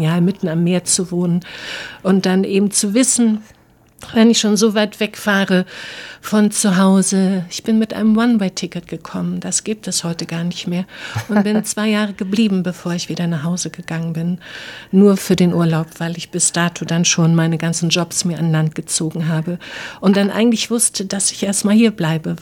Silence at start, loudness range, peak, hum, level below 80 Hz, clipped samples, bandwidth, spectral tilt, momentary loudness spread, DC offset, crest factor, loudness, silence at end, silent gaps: 0 s; 4 LU; -2 dBFS; none; -56 dBFS; under 0.1%; 17.5 kHz; -4.5 dB/octave; 11 LU; under 0.1%; 14 dB; -17 LUFS; 0 s; none